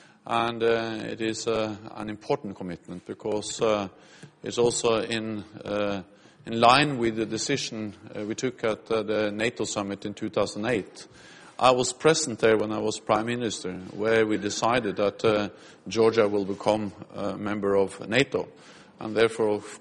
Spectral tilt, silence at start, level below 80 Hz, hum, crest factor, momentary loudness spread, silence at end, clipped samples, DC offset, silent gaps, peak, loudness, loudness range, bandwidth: -4 dB/octave; 0.25 s; -60 dBFS; none; 22 dB; 14 LU; 0 s; under 0.1%; under 0.1%; none; -4 dBFS; -26 LUFS; 4 LU; 11 kHz